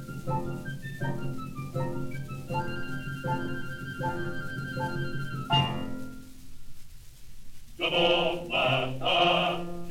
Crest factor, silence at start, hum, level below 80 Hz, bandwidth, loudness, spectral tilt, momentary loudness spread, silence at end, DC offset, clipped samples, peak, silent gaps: 18 dB; 0 s; none; -48 dBFS; 17 kHz; -30 LUFS; -5.5 dB/octave; 14 LU; 0 s; under 0.1%; under 0.1%; -12 dBFS; none